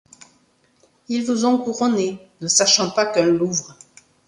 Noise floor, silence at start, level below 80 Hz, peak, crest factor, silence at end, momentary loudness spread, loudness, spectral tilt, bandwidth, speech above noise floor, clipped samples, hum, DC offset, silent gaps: -60 dBFS; 1.1 s; -62 dBFS; -2 dBFS; 18 dB; 0.55 s; 11 LU; -19 LUFS; -3 dB/octave; 11.5 kHz; 41 dB; under 0.1%; none; under 0.1%; none